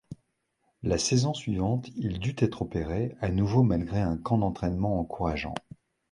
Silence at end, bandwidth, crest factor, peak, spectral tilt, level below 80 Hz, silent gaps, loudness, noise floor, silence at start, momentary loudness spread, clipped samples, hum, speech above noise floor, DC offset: 0.5 s; 11.5 kHz; 18 dB; -10 dBFS; -6 dB/octave; -44 dBFS; none; -28 LUFS; -75 dBFS; 0.1 s; 9 LU; under 0.1%; none; 47 dB; under 0.1%